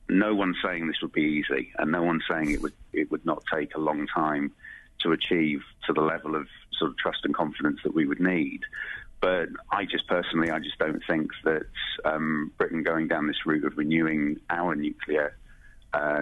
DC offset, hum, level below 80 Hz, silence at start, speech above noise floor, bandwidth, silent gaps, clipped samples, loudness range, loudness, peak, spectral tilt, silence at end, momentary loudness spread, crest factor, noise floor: under 0.1%; none; -52 dBFS; 0.05 s; 23 dB; 11.5 kHz; none; under 0.1%; 1 LU; -28 LUFS; -12 dBFS; -6.5 dB/octave; 0 s; 7 LU; 16 dB; -50 dBFS